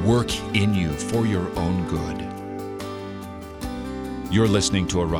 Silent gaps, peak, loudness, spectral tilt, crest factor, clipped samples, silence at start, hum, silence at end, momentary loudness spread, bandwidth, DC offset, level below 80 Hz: none; -6 dBFS; -24 LUFS; -5.5 dB/octave; 18 dB; under 0.1%; 0 s; none; 0 s; 13 LU; 19.5 kHz; under 0.1%; -40 dBFS